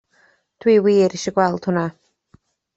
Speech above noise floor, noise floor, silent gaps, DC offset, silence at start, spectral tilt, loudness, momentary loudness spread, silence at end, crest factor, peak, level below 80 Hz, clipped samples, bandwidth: 42 dB; -59 dBFS; none; under 0.1%; 0.65 s; -6 dB/octave; -18 LUFS; 9 LU; 0.85 s; 18 dB; -2 dBFS; -62 dBFS; under 0.1%; 8 kHz